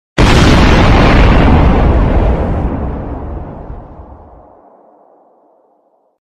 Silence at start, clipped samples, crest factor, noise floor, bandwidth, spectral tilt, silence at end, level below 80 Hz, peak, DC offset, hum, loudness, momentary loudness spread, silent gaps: 0.15 s; under 0.1%; 10 dB; -55 dBFS; 11.5 kHz; -6.5 dB/octave; 2.2 s; -14 dBFS; 0 dBFS; under 0.1%; none; -10 LUFS; 19 LU; none